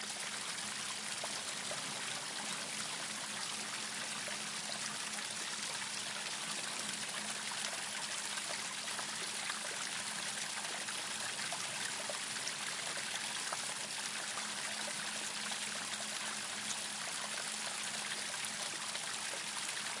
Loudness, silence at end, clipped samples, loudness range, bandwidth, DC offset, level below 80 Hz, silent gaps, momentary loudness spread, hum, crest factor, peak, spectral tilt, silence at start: -38 LUFS; 0 s; under 0.1%; 1 LU; 12 kHz; under 0.1%; under -90 dBFS; none; 1 LU; none; 22 dB; -20 dBFS; 0 dB/octave; 0 s